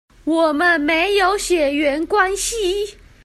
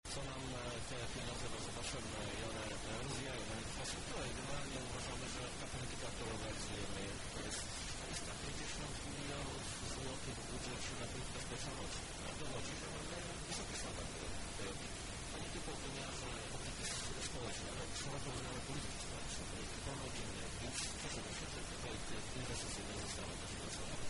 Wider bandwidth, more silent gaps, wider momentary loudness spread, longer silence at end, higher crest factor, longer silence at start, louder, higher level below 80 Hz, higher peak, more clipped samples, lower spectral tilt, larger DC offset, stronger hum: first, 14.5 kHz vs 11.5 kHz; neither; first, 7 LU vs 2 LU; first, 0.3 s vs 0 s; about the same, 16 dB vs 16 dB; first, 0.25 s vs 0.05 s; first, -17 LUFS vs -45 LUFS; first, -42 dBFS vs -54 dBFS; first, -2 dBFS vs -30 dBFS; neither; about the same, -2 dB/octave vs -3 dB/octave; neither; neither